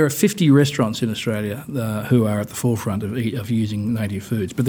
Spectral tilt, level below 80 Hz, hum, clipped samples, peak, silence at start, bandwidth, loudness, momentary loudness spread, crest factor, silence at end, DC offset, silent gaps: -6 dB/octave; -56 dBFS; none; under 0.1%; -4 dBFS; 0 s; over 20 kHz; -21 LUFS; 9 LU; 16 dB; 0 s; under 0.1%; none